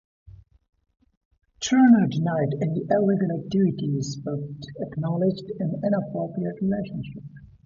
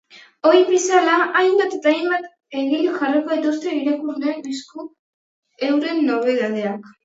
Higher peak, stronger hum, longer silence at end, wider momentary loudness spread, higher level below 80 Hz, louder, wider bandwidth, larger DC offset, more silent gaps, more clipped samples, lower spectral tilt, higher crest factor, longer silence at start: second, -6 dBFS vs -2 dBFS; neither; about the same, 0.2 s vs 0.15 s; about the same, 15 LU vs 13 LU; first, -58 dBFS vs -76 dBFS; second, -24 LUFS vs -19 LUFS; about the same, 7.6 kHz vs 8 kHz; neither; second, 1.17-1.31 s vs 4.99-5.43 s; neither; first, -7 dB/octave vs -3.5 dB/octave; about the same, 18 dB vs 18 dB; first, 0.3 s vs 0.15 s